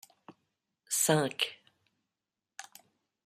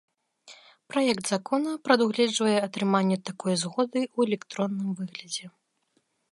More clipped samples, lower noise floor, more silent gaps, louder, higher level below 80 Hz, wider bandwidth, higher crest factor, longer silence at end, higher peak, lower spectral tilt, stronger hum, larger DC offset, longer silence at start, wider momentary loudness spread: neither; first, -90 dBFS vs -72 dBFS; neither; second, -30 LUFS vs -27 LUFS; about the same, -80 dBFS vs -78 dBFS; first, 16 kHz vs 11.5 kHz; about the same, 26 dB vs 22 dB; second, 0.65 s vs 0.85 s; second, -12 dBFS vs -6 dBFS; second, -3 dB/octave vs -4.5 dB/octave; neither; neither; second, 0.3 s vs 0.45 s; first, 23 LU vs 10 LU